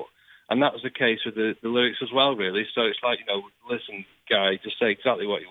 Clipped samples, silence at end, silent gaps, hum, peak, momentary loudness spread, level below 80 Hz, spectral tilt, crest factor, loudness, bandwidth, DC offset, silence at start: under 0.1%; 0 s; none; none; -6 dBFS; 10 LU; -70 dBFS; -6.5 dB/octave; 20 dB; -25 LUFS; 4.6 kHz; under 0.1%; 0 s